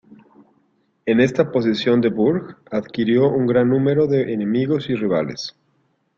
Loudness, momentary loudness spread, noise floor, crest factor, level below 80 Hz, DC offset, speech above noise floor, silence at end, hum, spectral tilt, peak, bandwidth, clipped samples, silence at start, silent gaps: -19 LUFS; 10 LU; -65 dBFS; 18 dB; -58 dBFS; under 0.1%; 47 dB; 0.7 s; none; -7.5 dB/octave; -2 dBFS; 7.6 kHz; under 0.1%; 1.05 s; none